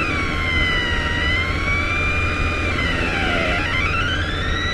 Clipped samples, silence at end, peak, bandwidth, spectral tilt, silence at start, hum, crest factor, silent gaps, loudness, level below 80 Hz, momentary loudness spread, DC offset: under 0.1%; 0 s; -6 dBFS; 11.5 kHz; -5 dB/octave; 0 s; none; 14 dB; none; -19 LUFS; -28 dBFS; 2 LU; under 0.1%